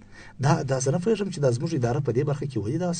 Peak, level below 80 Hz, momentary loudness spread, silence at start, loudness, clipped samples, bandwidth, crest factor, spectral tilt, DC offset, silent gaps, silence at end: -6 dBFS; -54 dBFS; 4 LU; 0 s; -25 LUFS; under 0.1%; 9.4 kHz; 20 dB; -6.5 dB/octave; under 0.1%; none; 0 s